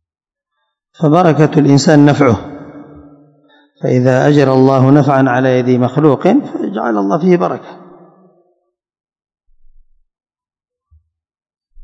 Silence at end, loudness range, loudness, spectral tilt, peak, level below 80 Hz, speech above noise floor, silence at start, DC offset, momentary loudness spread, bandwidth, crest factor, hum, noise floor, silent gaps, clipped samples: 4.05 s; 8 LU; -11 LUFS; -7.5 dB/octave; 0 dBFS; -52 dBFS; 78 dB; 1 s; under 0.1%; 11 LU; 8 kHz; 14 dB; none; -88 dBFS; none; 0.8%